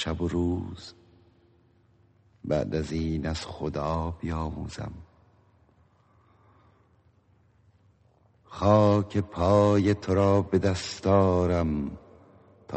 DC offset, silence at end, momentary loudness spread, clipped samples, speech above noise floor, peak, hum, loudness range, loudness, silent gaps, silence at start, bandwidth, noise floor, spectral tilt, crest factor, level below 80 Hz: under 0.1%; 0 s; 17 LU; under 0.1%; 38 dB; -8 dBFS; none; 13 LU; -26 LUFS; none; 0 s; 8.4 kHz; -63 dBFS; -7 dB/octave; 18 dB; -46 dBFS